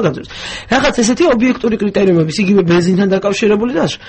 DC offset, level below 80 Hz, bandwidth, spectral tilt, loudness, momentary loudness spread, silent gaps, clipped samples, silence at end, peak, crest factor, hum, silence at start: under 0.1%; -40 dBFS; 8.8 kHz; -5.5 dB/octave; -13 LUFS; 6 LU; none; under 0.1%; 0 s; 0 dBFS; 12 dB; none; 0 s